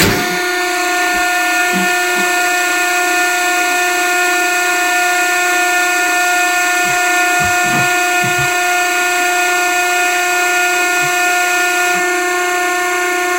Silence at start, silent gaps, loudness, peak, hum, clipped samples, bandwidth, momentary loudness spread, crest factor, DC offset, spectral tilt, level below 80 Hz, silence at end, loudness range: 0 s; none; -12 LUFS; 0 dBFS; none; under 0.1%; 16.5 kHz; 2 LU; 14 dB; 0.2%; -1.5 dB/octave; -46 dBFS; 0 s; 1 LU